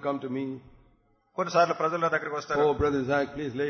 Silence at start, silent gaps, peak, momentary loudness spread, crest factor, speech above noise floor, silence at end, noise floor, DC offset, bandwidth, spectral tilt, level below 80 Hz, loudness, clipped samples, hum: 0 s; none; -10 dBFS; 10 LU; 18 dB; 38 dB; 0 s; -65 dBFS; under 0.1%; 6.6 kHz; -6 dB/octave; -52 dBFS; -27 LUFS; under 0.1%; none